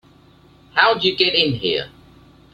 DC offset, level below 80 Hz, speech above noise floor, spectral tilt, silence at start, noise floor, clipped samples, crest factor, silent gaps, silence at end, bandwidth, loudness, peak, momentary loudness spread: under 0.1%; -54 dBFS; 32 dB; -5.5 dB/octave; 0.75 s; -50 dBFS; under 0.1%; 20 dB; none; 0.65 s; 9 kHz; -17 LUFS; 0 dBFS; 9 LU